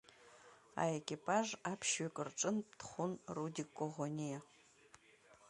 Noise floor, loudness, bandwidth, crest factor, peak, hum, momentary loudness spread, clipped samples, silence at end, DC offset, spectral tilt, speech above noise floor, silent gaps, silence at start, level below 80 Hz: -67 dBFS; -41 LUFS; 11.5 kHz; 22 dB; -22 dBFS; none; 12 LU; under 0.1%; 0 s; under 0.1%; -4 dB/octave; 26 dB; none; 0.2 s; -80 dBFS